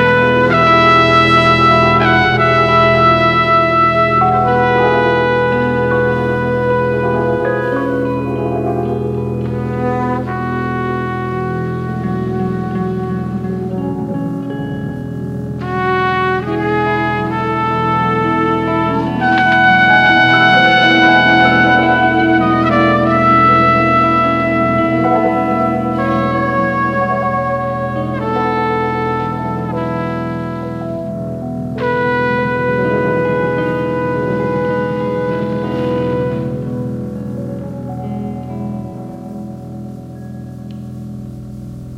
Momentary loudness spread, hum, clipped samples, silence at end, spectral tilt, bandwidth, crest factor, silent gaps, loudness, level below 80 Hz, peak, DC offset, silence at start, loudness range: 15 LU; none; under 0.1%; 0 s; -7 dB/octave; 9.8 kHz; 14 dB; none; -14 LUFS; -38 dBFS; 0 dBFS; 0.1%; 0 s; 11 LU